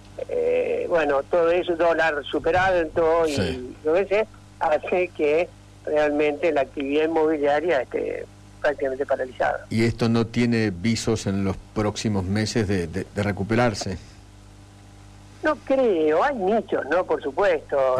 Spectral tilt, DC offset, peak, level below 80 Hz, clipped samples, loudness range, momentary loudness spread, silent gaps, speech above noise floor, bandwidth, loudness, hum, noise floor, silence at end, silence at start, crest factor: -6 dB/octave; under 0.1%; -12 dBFS; -48 dBFS; under 0.1%; 4 LU; 7 LU; none; 24 dB; 13 kHz; -23 LUFS; 50 Hz at -50 dBFS; -46 dBFS; 0 s; 0.05 s; 10 dB